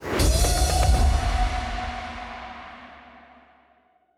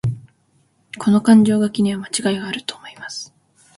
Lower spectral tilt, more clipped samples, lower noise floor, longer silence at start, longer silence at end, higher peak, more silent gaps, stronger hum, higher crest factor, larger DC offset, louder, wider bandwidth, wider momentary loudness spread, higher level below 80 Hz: second, -4 dB/octave vs -5.5 dB/octave; neither; about the same, -62 dBFS vs -61 dBFS; about the same, 0 s vs 0.05 s; first, 1.2 s vs 0.5 s; second, -8 dBFS vs -2 dBFS; neither; neither; about the same, 16 dB vs 18 dB; neither; second, -24 LUFS vs -17 LUFS; first, 16 kHz vs 11.5 kHz; about the same, 20 LU vs 22 LU; first, -26 dBFS vs -54 dBFS